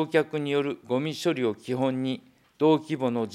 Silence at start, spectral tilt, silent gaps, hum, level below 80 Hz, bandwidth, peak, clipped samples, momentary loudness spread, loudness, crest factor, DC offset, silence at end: 0 s; -6.5 dB/octave; none; none; -78 dBFS; 14 kHz; -8 dBFS; under 0.1%; 6 LU; -27 LUFS; 18 dB; under 0.1%; 0 s